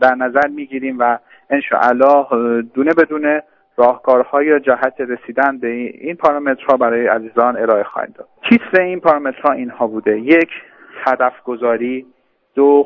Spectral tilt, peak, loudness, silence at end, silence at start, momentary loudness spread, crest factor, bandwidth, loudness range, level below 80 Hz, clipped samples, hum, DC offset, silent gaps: -7.5 dB/octave; 0 dBFS; -15 LUFS; 0 s; 0 s; 11 LU; 14 dB; 6.6 kHz; 2 LU; -62 dBFS; under 0.1%; none; under 0.1%; none